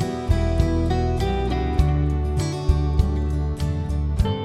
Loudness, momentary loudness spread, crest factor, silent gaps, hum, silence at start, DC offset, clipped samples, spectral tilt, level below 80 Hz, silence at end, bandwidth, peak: -23 LUFS; 4 LU; 16 dB; none; none; 0 s; under 0.1%; under 0.1%; -7.5 dB/octave; -24 dBFS; 0 s; 11.5 kHz; -4 dBFS